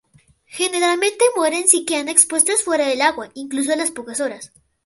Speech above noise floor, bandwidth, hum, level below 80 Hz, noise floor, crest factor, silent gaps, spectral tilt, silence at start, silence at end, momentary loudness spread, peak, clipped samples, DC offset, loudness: 36 dB; 16 kHz; none; -66 dBFS; -54 dBFS; 20 dB; none; 0 dB/octave; 0.5 s; 0.4 s; 12 LU; 0 dBFS; under 0.1%; under 0.1%; -17 LUFS